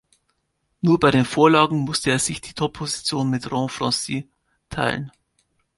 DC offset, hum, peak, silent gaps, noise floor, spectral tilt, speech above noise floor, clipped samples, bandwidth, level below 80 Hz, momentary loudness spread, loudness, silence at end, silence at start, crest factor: under 0.1%; none; -2 dBFS; none; -72 dBFS; -4.5 dB/octave; 52 dB; under 0.1%; 12 kHz; -52 dBFS; 12 LU; -21 LUFS; 0.7 s; 0.85 s; 20 dB